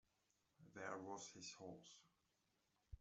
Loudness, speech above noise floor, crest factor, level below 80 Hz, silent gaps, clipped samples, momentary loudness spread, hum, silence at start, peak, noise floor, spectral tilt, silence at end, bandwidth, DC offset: -55 LUFS; 29 dB; 24 dB; -72 dBFS; none; under 0.1%; 14 LU; none; 0.6 s; -34 dBFS; -86 dBFS; -3 dB/octave; 0 s; 8 kHz; under 0.1%